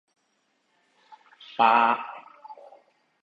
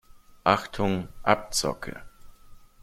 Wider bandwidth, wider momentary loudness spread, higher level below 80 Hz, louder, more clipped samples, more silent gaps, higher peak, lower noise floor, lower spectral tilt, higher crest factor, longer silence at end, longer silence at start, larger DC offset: second, 7 kHz vs 16.5 kHz; first, 27 LU vs 14 LU; second, -78 dBFS vs -48 dBFS; first, -22 LUFS vs -26 LUFS; neither; neither; second, -6 dBFS vs -2 dBFS; first, -72 dBFS vs -49 dBFS; about the same, -5 dB/octave vs -4 dB/octave; about the same, 22 dB vs 26 dB; first, 0.7 s vs 0.25 s; first, 1.6 s vs 0.15 s; neither